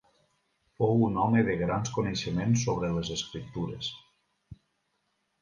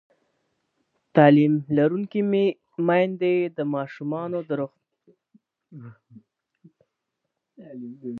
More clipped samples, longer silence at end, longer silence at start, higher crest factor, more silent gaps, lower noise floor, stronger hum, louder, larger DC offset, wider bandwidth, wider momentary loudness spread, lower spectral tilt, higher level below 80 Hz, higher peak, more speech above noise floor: neither; first, 0.9 s vs 0 s; second, 0.8 s vs 1.15 s; about the same, 18 dB vs 22 dB; neither; second, -77 dBFS vs -81 dBFS; neither; second, -29 LUFS vs -22 LUFS; neither; first, 10 kHz vs 4.5 kHz; second, 11 LU vs 22 LU; second, -5.5 dB/octave vs -10 dB/octave; first, -54 dBFS vs -74 dBFS; second, -12 dBFS vs -2 dBFS; second, 49 dB vs 59 dB